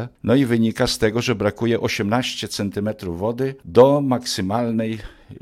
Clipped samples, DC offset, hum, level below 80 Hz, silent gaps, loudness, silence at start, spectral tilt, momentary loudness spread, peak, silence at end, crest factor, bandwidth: under 0.1%; under 0.1%; none; -46 dBFS; none; -20 LUFS; 0 s; -5.5 dB/octave; 11 LU; -2 dBFS; 0.05 s; 18 dB; 15.5 kHz